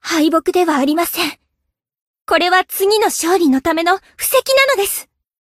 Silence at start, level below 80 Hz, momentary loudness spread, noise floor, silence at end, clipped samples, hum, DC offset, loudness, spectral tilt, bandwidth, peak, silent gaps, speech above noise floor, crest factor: 0.05 s; -52 dBFS; 5 LU; -75 dBFS; 0.4 s; under 0.1%; none; under 0.1%; -15 LUFS; -1.5 dB/octave; 16 kHz; 0 dBFS; 2.02-2.14 s; 60 dB; 16 dB